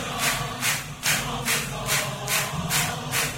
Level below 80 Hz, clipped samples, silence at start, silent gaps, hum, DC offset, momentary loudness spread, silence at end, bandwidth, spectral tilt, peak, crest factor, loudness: -46 dBFS; under 0.1%; 0 s; none; none; under 0.1%; 1 LU; 0 s; 16.5 kHz; -2 dB/octave; -8 dBFS; 18 dB; -24 LUFS